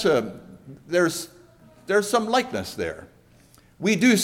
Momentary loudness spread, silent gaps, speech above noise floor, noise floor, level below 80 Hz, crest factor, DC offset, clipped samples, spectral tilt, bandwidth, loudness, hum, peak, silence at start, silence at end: 23 LU; none; 32 dB; -55 dBFS; -58 dBFS; 18 dB; under 0.1%; under 0.1%; -4 dB/octave; 16.5 kHz; -24 LUFS; none; -6 dBFS; 0 s; 0 s